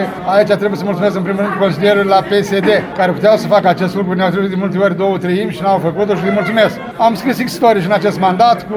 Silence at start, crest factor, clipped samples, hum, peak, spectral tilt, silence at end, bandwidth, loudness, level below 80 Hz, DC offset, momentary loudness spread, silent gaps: 0 s; 12 dB; under 0.1%; none; 0 dBFS; -6.5 dB/octave; 0 s; 19 kHz; -13 LUFS; -50 dBFS; under 0.1%; 5 LU; none